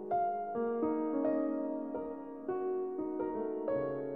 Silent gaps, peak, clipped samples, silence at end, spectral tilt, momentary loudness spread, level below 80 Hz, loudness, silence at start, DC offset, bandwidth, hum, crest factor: none; -22 dBFS; under 0.1%; 0 s; -10.5 dB/octave; 7 LU; -72 dBFS; -36 LUFS; 0 s; under 0.1%; 3.8 kHz; none; 14 dB